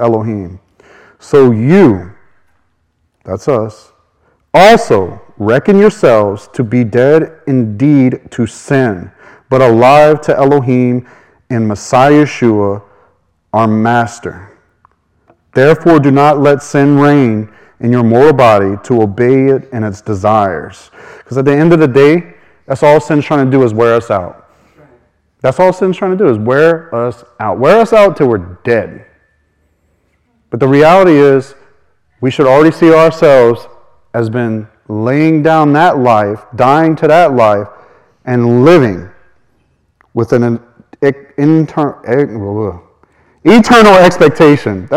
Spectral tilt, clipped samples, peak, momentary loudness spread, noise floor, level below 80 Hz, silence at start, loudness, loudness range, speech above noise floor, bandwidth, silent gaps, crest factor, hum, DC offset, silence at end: -7 dB/octave; 2%; 0 dBFS; 13 LU; -60 dBFS; -44 dBFS; 0 s; -9 LUFS; 4 LU; 51 dB; 15 kHz; none; 10 dB; none; under 0.1%; 0 s